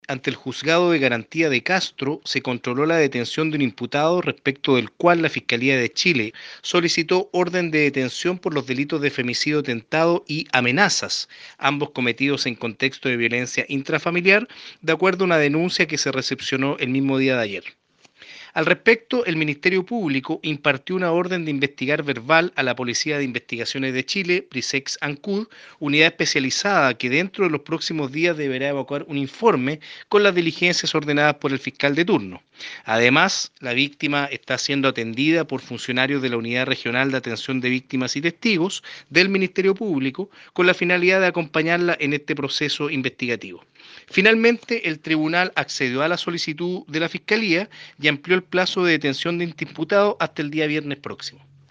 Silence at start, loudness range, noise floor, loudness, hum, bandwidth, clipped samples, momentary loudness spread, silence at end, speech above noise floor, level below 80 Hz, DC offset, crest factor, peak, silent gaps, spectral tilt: 0.1 s; 2 LU; -50 dBFS; -21 LUFS; none; 9.8 kHz; under 0.1%; 9 LU; 0.4 s; 28 dB; -68 dBFS; under 0.1%; 22 dB; 0 dBFS; none; -4.5 dB/octave